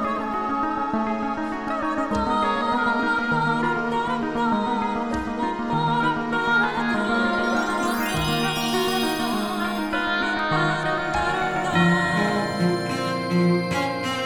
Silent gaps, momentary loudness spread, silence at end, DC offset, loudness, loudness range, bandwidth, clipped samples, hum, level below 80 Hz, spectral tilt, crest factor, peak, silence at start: none; 5 LU; 0 s; under 0.1%; -23 LUFS; 1 LU; 18 kHz; under 0.1%; none; -46 dBFS; -5 dB/octave; 16 dB; -8 dBFS; 0 s